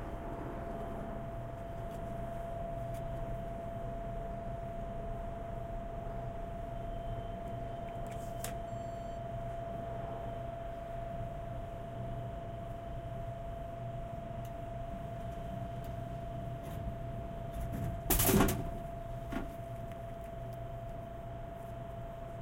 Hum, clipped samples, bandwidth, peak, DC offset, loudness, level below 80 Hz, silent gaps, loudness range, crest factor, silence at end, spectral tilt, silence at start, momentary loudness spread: none; under 0.1%; 16 kHz; -14 dBFS; under 0.1%; -40 LUFS; -46 dBFS; none; 8 LU; 26 dB; 0 s; -5.5 dB/octave; 0 s; 3 LU